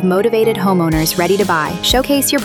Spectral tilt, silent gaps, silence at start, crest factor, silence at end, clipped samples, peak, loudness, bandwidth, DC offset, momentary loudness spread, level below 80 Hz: -4 dB/octave; none; 0 s; 12 dB; 0 s; under 0.1%; -2 dBFS; -14 LUFS; 19 kHz; under 0.1%; 2 LU; -32 dBFS